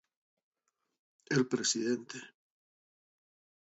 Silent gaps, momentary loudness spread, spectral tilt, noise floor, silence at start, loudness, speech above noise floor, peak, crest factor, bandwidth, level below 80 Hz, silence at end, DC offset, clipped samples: none; 16 LU; -4 dB/octave; under -90 dBFS; 1.3 s; -32 LUFS; over 57 dB; -16 dBFS; 22 dB; 8 kHz; -82 dBFS; 1.35 s; under 0.1%; under 0.1%